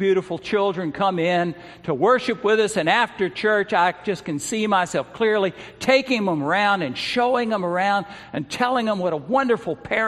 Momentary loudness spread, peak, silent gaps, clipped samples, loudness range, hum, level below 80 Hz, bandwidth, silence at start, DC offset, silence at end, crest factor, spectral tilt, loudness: 8 LU; -2 dBFS; none; under 0.1%; 1 LU; none; -60 dBFS; 13.5 kHz; 0 s; under 0.1%; 0 s; 18 dB; -4.5 dB/octave; -21 LUFS